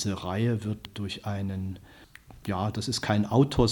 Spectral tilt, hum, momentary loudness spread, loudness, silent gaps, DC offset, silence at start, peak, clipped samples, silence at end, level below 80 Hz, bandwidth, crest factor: -6 dB/octave; none; 12 LU; -29 LUFS; none; under 0.1%; 0 s; -8 dBFS; under 0.1%; 0 s; -46 dBFS; 18 kHz; 20 dB